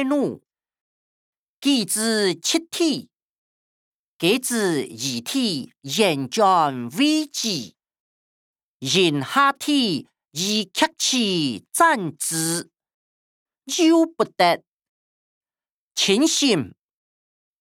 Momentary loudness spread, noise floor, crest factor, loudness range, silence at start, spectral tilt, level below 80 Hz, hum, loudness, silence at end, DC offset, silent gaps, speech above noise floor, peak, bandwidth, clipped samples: 10 LU; under -90 dBFS; 20 dB; 3 LU; 0 s; -3 dB/octave; -74 dBFS; none; -21 LUFS; 0.9 s; under 0.1%; 0.81-1.58 s, 3.25-4.19 s, 8.00-8.54 s, 8.63-8.80 s, 12.94-13.46 s, 14.71-14.80 s, 14.89-15.41 s, 15.70-15.91 s; over 69 dB; -4 dBFS; 19 kHz; under 0.1%